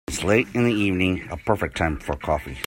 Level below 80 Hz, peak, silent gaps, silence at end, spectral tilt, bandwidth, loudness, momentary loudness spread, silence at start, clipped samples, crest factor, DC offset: -40 dBFS; -4 dBFS; none; 0 s; -5.5 dB/octave; 16.5 kHz; -23 LUFS; 6 LU; 0.1 s; under 0.1%; 18 dB; under 0.1%